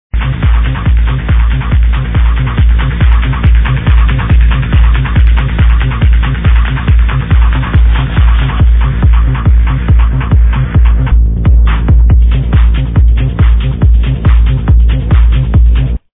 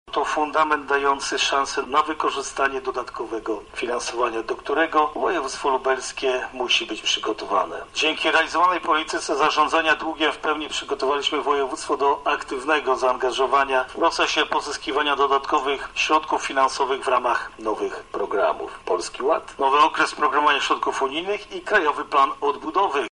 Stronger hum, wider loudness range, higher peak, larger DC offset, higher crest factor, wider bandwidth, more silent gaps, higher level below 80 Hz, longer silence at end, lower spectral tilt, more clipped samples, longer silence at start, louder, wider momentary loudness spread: neither; about the same, 1 LU vs 3 LU; first, 0 dBFS vs -6 dBFS; neither; second, 6 dB vs 16 dB; second, 3.8 kHz vs 10.5 kHz; neither; first, -8 dBFS vs -54 dBFS; about the same, 0.15 s vs 0.05 s; first, -10.5 dB/octave vs -1.5 dB/octave; first, 0.3% vs under 0.1%; about the same, 0.15 s vs 0.05 s; first, -10 LUFS vs -22 LUFS; second, 2 LU vs 7 LU